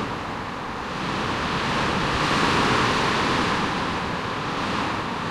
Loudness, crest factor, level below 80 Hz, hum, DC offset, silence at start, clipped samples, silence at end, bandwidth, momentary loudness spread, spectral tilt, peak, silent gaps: -23 LUFS; 16 dB; -42 dBFS; none; under 0.1%; 0 s; under 0.1%; 0 s; 15 kHz; 10 LU; -4.5 dB/octave; -8 dBFS; none